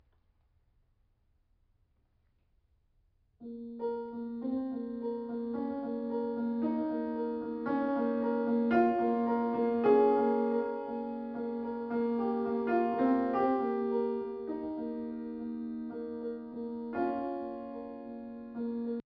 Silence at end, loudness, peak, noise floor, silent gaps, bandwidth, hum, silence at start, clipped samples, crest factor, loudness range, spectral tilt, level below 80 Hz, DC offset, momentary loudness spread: 0.1 s; -33 LUFS; -14 dBFS; -72 dBFS; none; 5.2 kHz; none; 3.4 s; under 0.1%; 20 dB; 10 LU; -6 dB/octave; -70 dBFS; under 0.1%; 12 LU